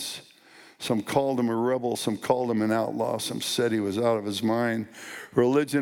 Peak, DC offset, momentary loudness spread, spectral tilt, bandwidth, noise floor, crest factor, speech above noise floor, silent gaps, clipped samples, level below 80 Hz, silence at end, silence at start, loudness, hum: -8 dBFS; under 0.1%; 8 LU; -5 dB/octave; 18 kHz; -53 dBFS; 18 dB; 27 dB; none; under 0.1%; -68 dBFS; 0 s; 0 s; -26 LUFS; none